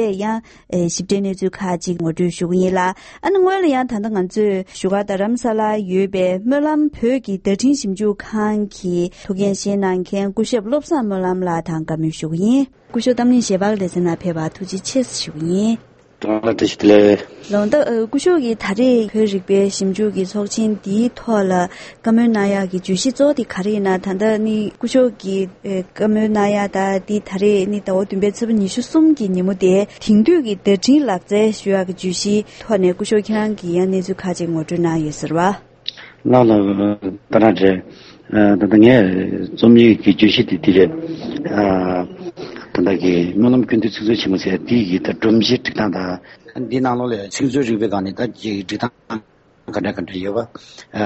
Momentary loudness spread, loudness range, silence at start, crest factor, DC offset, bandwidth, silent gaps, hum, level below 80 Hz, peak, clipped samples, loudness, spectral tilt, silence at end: 10 LU; 6 LU; 0 s; 16 dB; under 0.1%; 8.8 kHz; none; none; -50 dBFS; 0 dBFS; under 0.1%; -17 LUFS; -6 dB/octave; 0 s